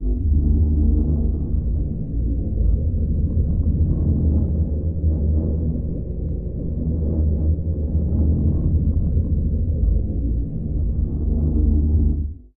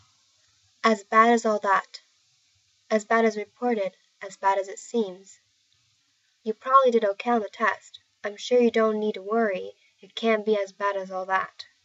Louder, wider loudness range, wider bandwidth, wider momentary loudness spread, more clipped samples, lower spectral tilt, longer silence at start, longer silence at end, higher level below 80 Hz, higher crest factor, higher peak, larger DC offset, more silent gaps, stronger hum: about the same, -22 LUFS vs -24 LUFS; about the same, 2 LU vs 4 LU; second, 1.2 kHz vs 8.2 kHz; second, 6 LU vs 17 LU; neither; first, -15.5 dB/octave vs -4 dB/octave; second, 0 s vs 0.85 s; second, 0.1 s vs 0.25 s; first, -22 dBFS vs -86 dBFS; second, 12 dB vs 20 dB; about the same, -8 dBFS vs -6 dBFS; neither; neither; neither